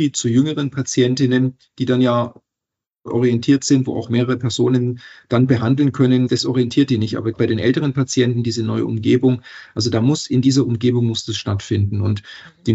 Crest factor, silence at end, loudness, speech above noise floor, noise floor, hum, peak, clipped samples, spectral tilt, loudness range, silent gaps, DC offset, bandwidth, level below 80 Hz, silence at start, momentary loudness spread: 16 dB; 0 s; -18 LUFS; 68 dB; -85 dBFS; none; -2 dBFS; under 0.1%; -6 dB/octave; 2 LU; none; under 0.1%; 8.2 kHz; -58 dBFS; 0 s; 7 LU